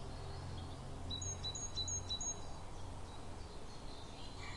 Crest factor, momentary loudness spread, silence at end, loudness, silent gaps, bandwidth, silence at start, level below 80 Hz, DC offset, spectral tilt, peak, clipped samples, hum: 16 dB; 12 LU; 0 s; -45 LUFS; none; 11.5 kHz; 0 s; -52 dBFS; under 0.1%; -2.5 dB/octave; -30 dBFS; under 0.1%; none